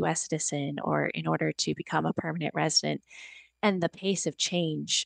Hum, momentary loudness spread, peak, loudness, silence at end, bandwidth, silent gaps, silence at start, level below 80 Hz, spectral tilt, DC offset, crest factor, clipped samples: none; 7 LU; -12 dBFS; -29 LUFS; 0 s; 10 kHz; none; 0 s; -72 dBFS; -3.5 dB/octave; under 0.1%; 18 dB; under 0.1%